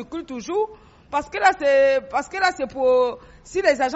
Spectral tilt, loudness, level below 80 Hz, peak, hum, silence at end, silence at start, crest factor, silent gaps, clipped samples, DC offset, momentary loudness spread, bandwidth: -1 dB/octave; -21 LUFS; -52 dBFS; -4 dBFS; none; 0 s; 0 s; 18 dB; none; under 0.1%; under 0.1%; 12 LU; 8 kHz